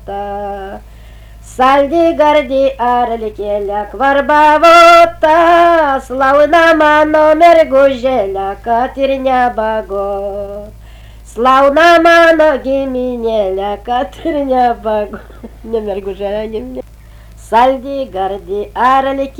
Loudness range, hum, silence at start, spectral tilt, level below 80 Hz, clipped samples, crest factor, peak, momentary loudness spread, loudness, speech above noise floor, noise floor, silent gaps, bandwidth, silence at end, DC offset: 10 LU; none; 0 s; -4.5 dB/octave; -36 dBFS; under 0.1%; 12 dB; 0 dBFS; 15 LU; -10 LUFS; 25 dB; -35 dBFS; none; 19 kHz; 0.1 s; under 0.1%